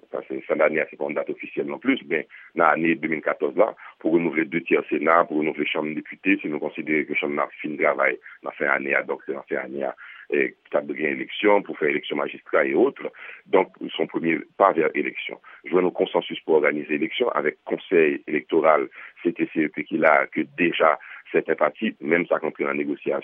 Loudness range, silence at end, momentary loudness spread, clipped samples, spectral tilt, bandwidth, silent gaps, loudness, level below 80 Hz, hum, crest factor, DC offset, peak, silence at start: 3 LU; 0 s; 10 LU; under 0.1%; -8.5 dB/octave; 3.8 kHz; none; -23 LUFS; -80 dBFS; none; 22 dB; under 0.1%; -2 dBFS; 0.15 s